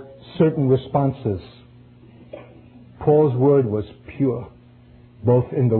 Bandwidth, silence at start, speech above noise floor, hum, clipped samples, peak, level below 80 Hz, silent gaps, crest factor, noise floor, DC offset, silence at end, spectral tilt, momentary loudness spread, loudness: 4.4 kHz; 0 s; 29 dB; none; under 0.1%; -4 dBFS; -50 dBFS; none; 16 dB; -48 dBFS; under 0.1%; 0 s; -13 dB/octave; 24 LU; -20 LUFS